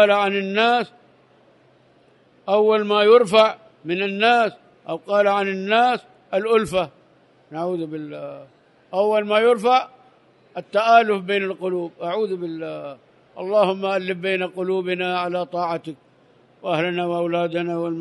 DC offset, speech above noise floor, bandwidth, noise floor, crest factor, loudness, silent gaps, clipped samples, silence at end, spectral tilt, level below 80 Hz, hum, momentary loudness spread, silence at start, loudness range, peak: under 0.1%; 36 dB; 11.5 kHz; -56 dBFS; 20 dB; -20 LUFS; none; under 0.1%; 0 s; -5.5 dB/octave; -64 dBFS; none; 17 LU; 0 s; 6 LU; 0 dBFS